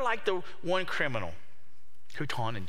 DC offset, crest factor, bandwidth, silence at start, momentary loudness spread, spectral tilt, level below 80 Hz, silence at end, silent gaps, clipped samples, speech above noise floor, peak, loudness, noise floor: 3%; 20 dB; 16 kHz; 0 s; 14 LU; -5 dB/octave; -64 dBFS; 0 s; none; under 0.1%; 33 dB; -14 dBFS; -33 LUFS; -66 dBFS